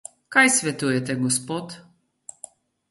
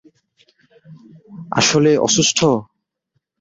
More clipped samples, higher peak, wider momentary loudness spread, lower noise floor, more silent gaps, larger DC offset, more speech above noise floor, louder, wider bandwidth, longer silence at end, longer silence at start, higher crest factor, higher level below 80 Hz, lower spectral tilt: neither; about the same, -4 dBFS vs -2 dBFS; first, 26 LU vs 8 LU; second, -48 dBFS vs -71 dBFS; neither; neither; second, 26 dB vs 56 dB; second, -21 LUFS vs -15 LUFS; first, 12 kHz vs 8 kHz; first, 1.1 s vs 0.75 s; second, 0.3 s vs 0.9 s; about the same, 22 dB vs 18 dB; second, -68 dBFS vs -56 dBFS; about the same, -3 dB/octave vs -3.5 dB/octave